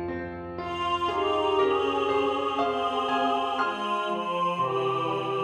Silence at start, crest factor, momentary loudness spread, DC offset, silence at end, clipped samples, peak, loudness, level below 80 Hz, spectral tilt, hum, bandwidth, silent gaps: 0 s; 14 dB; 6 LU; under 0.1%; 0 s; under 0.1%; -14 dBFS; -27 LUFS; -62 dBFS; -5.5 dB/octave; none; 10.5 kHz; none